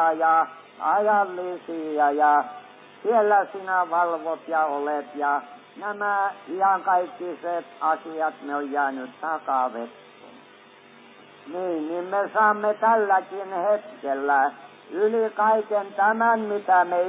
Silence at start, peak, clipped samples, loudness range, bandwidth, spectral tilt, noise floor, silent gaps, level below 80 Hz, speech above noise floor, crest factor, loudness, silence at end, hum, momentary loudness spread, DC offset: 0 s; -8 dBFS; under 0.1%; 6 LU; 4 kHz; -8.5 dB/octave; -50 dBFS; none; under -90 dBFS; 27 dB; 16 dB; -24 LUFS; 0 s; none; 11 LU; under 0.1%